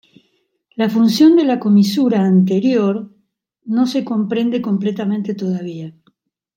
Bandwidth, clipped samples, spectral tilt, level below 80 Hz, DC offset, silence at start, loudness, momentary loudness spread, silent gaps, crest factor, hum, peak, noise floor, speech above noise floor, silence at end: 16 kHz; under 0.1%; -7 dB/octave; -68 dBFS; under 0.1%; 0.8 s; -16 LUFS; 13 LU; none; 14 dB; none; -2 dBFS; -65 dBFS; 50 dB; 0.65 s